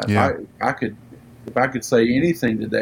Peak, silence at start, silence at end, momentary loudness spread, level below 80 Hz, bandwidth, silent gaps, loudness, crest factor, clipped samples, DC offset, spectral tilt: -2 dBFS; 0 s; 0 s; 10 LU; -54 dBFS; 17 kHz; none; -21 LUFS; 18 dB; under 0.1%; under 0.1%; -6 dB/octave